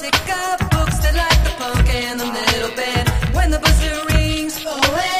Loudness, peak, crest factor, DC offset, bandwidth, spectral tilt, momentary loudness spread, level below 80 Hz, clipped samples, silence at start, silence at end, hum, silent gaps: -18 LUFS; 0 dBFS; 16 dB; under 0.1%; 15.5 kHz; -4 dB/octave; 5 LU; -20 dBFS; under 0.1%; 0 s; 0 s; none; none